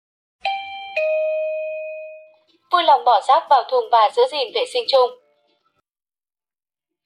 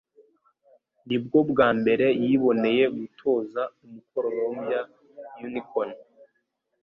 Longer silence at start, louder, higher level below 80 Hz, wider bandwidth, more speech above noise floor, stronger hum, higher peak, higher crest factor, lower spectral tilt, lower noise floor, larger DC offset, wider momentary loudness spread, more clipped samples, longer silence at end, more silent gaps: second, 0.45 s vs 1.05 s; first, -18 LUFS vs -25 LUFS; second, -76 dBFS vs -66 dBFS; first, 10.5 kHz vs 5.6 kHz; first, over 74 dB vs 51 dB; neither; about the same, -4 dBFS vs -6 dBFS; about the same, 16 dB vs 20 dB; second, -0.5 dB/octave vs -9 dB/octave; first, under -90 dBFS vs -75 dBFS; neither; about the same, 13 LU vs 14 LU; neither; first, 1.9 s vs 0.8 s; neither